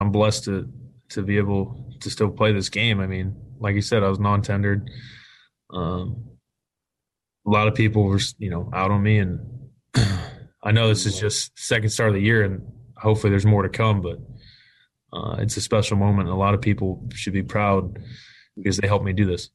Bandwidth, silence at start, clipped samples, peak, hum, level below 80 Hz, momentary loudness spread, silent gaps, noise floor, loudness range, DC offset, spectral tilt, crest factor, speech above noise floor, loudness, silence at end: 12 kHz; 0 s; under 0.1%; -8 dBFS; none; -46 dBFS; 14 LU; none; -85 dBFS; 4 LU; under 0.1%; -5.5 dB/octave; 16 dB; 64 dB; -22 LUFS; 0.1 s